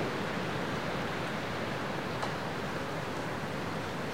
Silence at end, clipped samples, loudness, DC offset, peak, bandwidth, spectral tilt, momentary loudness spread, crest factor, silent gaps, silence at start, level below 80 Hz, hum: 0 s; under 0.1%; -35 LUFS; 0.4%; -20 dBFS; 16 kHz; -5 dB/octave; 2 LU; 16 dB; none; 0 s; -58 dBFS; none